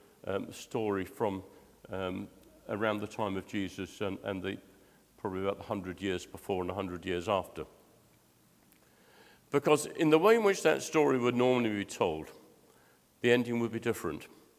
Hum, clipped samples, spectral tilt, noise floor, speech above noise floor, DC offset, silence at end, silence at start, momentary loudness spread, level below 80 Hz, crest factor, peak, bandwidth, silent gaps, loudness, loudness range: none; under 0.1%; -5 dB/octave; -65 dBFS; 34 dB; under 0.1%; 0.3 s; 0.25 s; 14 LU; -62 dBFS; 22 dB; -10 dBFS; 16 kHz; none; -32 LUFS; 9 LU